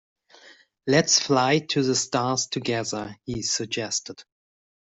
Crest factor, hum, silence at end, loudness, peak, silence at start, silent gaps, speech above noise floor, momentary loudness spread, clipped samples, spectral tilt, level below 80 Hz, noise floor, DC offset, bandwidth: 22 dB; none; 0.6 s; -23 LUFS; -4 dBFS; 0.45 s; none; 29 dB; 13 LU; under 0.1%; -3 dB/octave; -60 dBFS; -53 dBFS; under 0.1%; 8.2 kHz